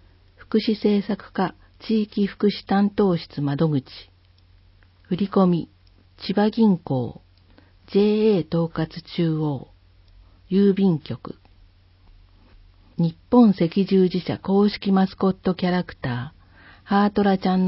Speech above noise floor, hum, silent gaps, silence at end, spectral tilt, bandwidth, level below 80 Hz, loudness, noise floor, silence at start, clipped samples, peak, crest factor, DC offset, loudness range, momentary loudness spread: 34 dB; none; none; 0 s; -12 dB/octave; 5.8 kHz; -52 dBFS; -22 LUFS; -54 dBFS; 0.5 s; under 0.1%; -4 dBFS; 20 dB; under 0.1%; 5 LU; 12 LU